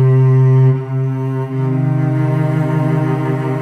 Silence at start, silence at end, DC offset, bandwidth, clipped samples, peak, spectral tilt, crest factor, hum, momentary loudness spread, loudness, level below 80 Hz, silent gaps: 0 s; 0 s; under 0.1%; 3.3 kHz; under 0.1%; -4 dBFS; -10 dB/octave; 10 dB; none; 8 LU; -15 LUFS; -52 dBFS; none